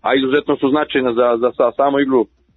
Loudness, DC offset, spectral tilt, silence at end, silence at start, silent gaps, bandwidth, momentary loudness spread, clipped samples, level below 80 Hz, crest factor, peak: -16 LUFS; under 0.1%; -8.5 dB/octave; 0.3 s; 0.05 s; none; 4.1 kHz; 2 LU; under 0.1%; -56 dBFS; 12 dB; -2 dBFS